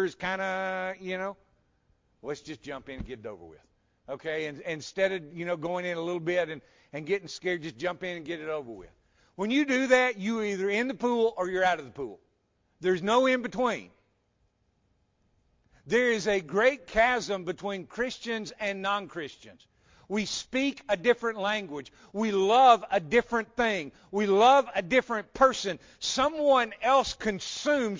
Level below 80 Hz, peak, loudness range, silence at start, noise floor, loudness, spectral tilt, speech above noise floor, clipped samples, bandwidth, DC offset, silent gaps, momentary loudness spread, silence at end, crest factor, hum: -60 dBFS; -6 dBFS; 10 LU; 0 s; -72 dBFS; -28 LUFS; -4 dB/octave; 44 dB; under 0.1%; 7.6 kHz; under 0.1%; none; 16 LU; 0 s; 22 dB; none